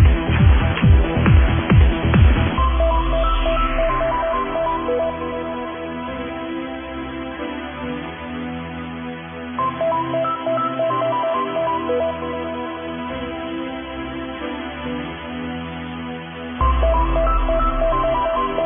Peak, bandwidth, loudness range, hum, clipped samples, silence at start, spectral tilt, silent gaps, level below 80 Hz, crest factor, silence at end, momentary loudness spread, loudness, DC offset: -2 dBFS; 3.7 kHz; 11 LU; none; under 0.1%; 0 s; -11 dB/octave; none; -24 dBFS; 16 dB; 0 s; 13 LU; -21 LUFS; under 0.1%